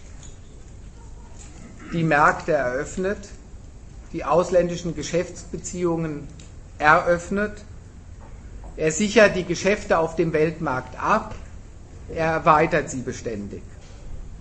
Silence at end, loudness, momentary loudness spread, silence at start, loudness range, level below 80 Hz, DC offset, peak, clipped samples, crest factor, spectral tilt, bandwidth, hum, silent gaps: 0 s; -22 LUFS; 26 LU; 0 s; 4 LU; -42 dBFS; under 0.1%; 0 dBFS; under 0.1%; 24 dB; -5 dB/octave; 8.8 kHz; none; none